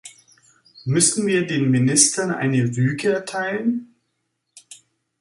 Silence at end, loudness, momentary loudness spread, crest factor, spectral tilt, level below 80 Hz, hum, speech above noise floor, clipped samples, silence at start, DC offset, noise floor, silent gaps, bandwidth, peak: 0.45 s; -19 LUFS; 10 LU; 22 dB; -4 dB/octave; -62 dBFS; none; 55 dB; under 0.1%; 0.05 s; under 0.1%; -74 dBFS; none; 11.5 kHz; 0 dBFS